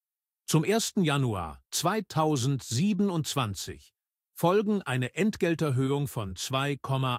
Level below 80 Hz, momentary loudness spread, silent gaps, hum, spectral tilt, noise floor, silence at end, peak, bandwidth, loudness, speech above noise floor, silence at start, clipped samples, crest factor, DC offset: -58 dBFS; 7 LU; none; none; -5 dB/octave; -48 dBFS; 0 s; -12 dBFS; 16 kHz; -28 LUFS; 20 dB; 0.5 s; under 0.1%; 18 dB; under 0.1%